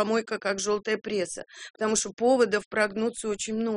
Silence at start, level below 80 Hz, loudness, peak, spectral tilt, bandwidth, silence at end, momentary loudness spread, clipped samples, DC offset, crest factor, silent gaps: 0 s; -64 dBFS; -27 LUFS; -10 dBFS; -3 dB/octave; 10.5 kHz; 0 s; 8 LU; under 0.1%; under 0.1%; 18 dB; 1.70-1.74 s, 2.66-2.71 s